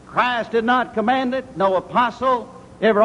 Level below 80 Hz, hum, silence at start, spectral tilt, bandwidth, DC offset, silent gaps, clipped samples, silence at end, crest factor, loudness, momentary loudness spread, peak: -54 dBFS; none; 0.1 s; -6 dB/octave; 11 kHz; under 0.1%; none; under 0.1%; 0 s; 16 dB; -20 LUFS; 4 LU; -4 dBFS